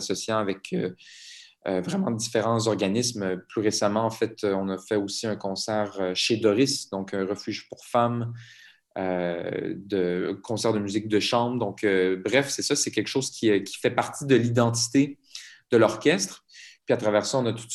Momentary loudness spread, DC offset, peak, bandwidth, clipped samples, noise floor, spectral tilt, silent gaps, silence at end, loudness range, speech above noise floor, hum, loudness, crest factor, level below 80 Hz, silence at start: 10 LU; under 0.1%; -6 dBFS; 13 kHz; under 0.1%; -46 dBFS; -4.5 dB/octave; none; 0 s; 4 LU; 20 dB; none; -25 LUFS; 20 dB; -70 dBFS; 0 s